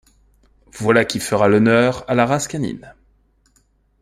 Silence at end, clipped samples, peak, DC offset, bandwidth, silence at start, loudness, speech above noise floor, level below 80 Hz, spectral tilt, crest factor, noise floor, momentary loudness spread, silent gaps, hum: 1.1 s; under 0.1%; -2 dBFS; under 0.1%; 15.5 kHz; 0.75 s; -17 LUFS; 43 dB; -52 dBFS; -5.5 dB/octave; 18 dB; -60 dBFS; 12 LU; none; 50 Hz at -50 dBFS